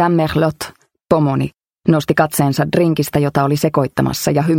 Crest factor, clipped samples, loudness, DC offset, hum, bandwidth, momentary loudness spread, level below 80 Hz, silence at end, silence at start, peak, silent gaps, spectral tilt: 16 dB; under 0.1%; -16 LUFS; under 0.1%; none; 17 kHz; 6 LU; -44 dBFS; 0 s; 0 s; 0 dBFS; none; -6 dB/octave